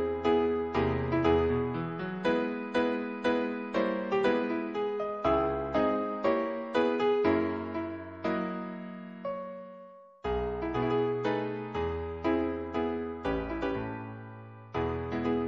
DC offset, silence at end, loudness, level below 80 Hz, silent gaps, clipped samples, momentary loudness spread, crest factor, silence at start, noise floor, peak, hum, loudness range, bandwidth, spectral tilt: under 0.1%; 0 s; -31 LUFS; -48 dBFS; none; under 0.1%; 12 LU; 18 dB; 0 s; -51 dBFS; -12 dBFS; none; 5 LU; 7.4 kHz; -8 dB/octave